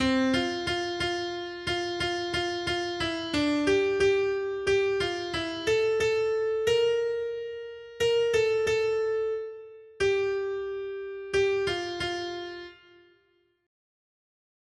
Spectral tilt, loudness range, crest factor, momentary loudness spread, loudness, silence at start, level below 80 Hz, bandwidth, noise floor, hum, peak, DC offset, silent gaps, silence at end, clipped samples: -4 dB/octave; 6 LU; 14 dB; 11 LU; -28 LUFS; 0 s; -56 dBFS; 12.5 kHz; -69 dBFS; none; -14 dBFS; under 0.1%; none; 1.9 s; under 0.1%